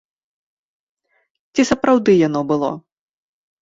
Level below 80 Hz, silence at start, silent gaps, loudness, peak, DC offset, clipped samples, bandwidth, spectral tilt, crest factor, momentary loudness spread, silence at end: -54 dBFS; 1.55 s; none; -17 LUFS; -2 dBFS; under 0.1%; under 0.1%; 7.8 kHz; -5.5 dB/octave; 18 dB; 11 LU; 0.85 s